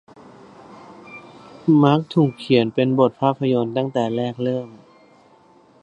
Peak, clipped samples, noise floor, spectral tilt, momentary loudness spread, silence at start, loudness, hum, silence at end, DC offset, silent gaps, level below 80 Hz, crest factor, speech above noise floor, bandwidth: 0 dBFS; under 0.1%; -52 dBFS; -8.5 dB/octave; 23 LU; 0.7 s; -19 LUFS; none; 1.05 s; under 0.1%; none; -64 dBFS; 20 dB; 34 dB; 9.4 kHz